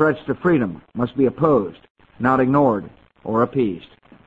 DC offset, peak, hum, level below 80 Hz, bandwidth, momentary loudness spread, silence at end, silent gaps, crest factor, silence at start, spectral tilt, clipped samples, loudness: under 0.1%; -2 dBFS; none; -52 dBFS; 7.6 kHz; 10 LU; 0.4 s; 1.90-1.95 s; 18 dB; 0 s; -10 dB/octave; under 0.1%; -20 LUFS